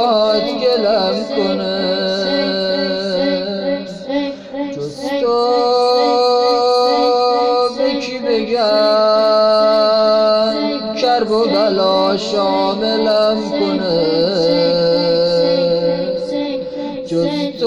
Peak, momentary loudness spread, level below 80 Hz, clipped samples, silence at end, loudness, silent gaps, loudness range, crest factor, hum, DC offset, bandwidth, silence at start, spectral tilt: -4 dBFS; 8 LU; -52 dBFS; under 0.1%; 0 s; -15 LUFS; none; 4 LU; 12 dB; none; under 0.1%; 10.5 kHz; 0 s; -5.5 dB/octave